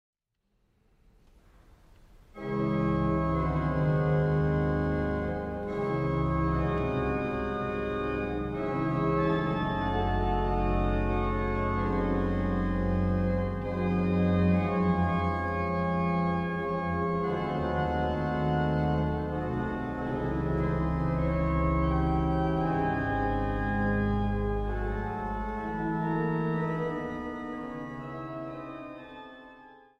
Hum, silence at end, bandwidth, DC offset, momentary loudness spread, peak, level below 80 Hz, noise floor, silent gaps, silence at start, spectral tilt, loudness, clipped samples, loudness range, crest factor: none; 0.25 s; 6.4 kHz; under 0.1%; 7 LU; -14 dBFS; -38 dBFS; -76 dBFS; none; 2.35 s; -9.5 dB/octave; -29 LUFS; under 0.1%; 4 LU; 14 dB